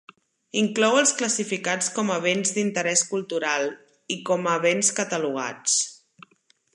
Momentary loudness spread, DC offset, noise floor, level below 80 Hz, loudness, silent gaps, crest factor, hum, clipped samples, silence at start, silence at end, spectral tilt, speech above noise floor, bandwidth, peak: 8 LU; under 0.1%; -64 dBFS; -76 dBFS; -23 LUFS; none; 20 dB; none; under 0.1%; 0.55 s; 0.8 s; -2.5 dB/octave; 40 dB; 11.5 kHz; -4 dBFS